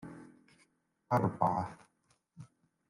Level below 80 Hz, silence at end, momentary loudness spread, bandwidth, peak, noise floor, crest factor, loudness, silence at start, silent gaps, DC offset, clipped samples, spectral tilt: -70 dBFS; 0.45 s; 25 LU; 12 kHz; -14 dBFS; -75 dBFS; 24 dB; -33 LUFS; 0 s; none; under 0.1%; under 0.1%; -8.5 dB/octave